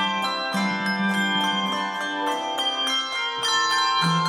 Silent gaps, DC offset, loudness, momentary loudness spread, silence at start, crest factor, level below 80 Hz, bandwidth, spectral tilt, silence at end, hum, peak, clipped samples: none; under 0.1%; -23 LUFS; 5 LU; 0 s; 14 dB; -74 dBFS; 16 kHz; -3 dB/octave; 0 s; none; -10 dBFS; under 0.1%